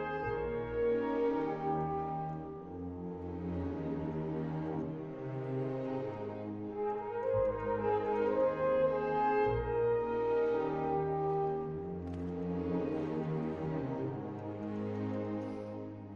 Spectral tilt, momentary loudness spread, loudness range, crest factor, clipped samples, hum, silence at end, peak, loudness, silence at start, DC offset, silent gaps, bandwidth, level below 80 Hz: -9.5 dB/octave; 10 LU; 7 LU; 14 dB; under 0.1%; none; 0 s; -20 dBFS; -36 LUFS; 0 s; under 0.1%; none; 6.6 kHz; -56 dBFS